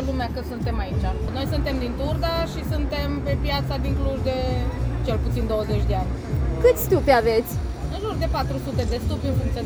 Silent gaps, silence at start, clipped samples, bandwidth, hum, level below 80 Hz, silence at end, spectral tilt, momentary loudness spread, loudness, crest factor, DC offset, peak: none; 0 s; under 0.1%; over 20 kHz; none; -28 dBFS; 0 s; -6.5 dB/octave; 8 LU; -24 LUFS; 18 dB; under 0.1%; -4 dBFS